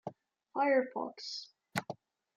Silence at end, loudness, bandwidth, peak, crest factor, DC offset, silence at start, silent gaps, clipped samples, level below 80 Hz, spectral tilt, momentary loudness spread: 0.4 s; -35 LUFS; 15.5 kHz; -16 dBFS; 22 dB; under 0.1%; 0.05 s; none; under 0.1%; -84 dBFS; -4.5 dB/octave; 19 LU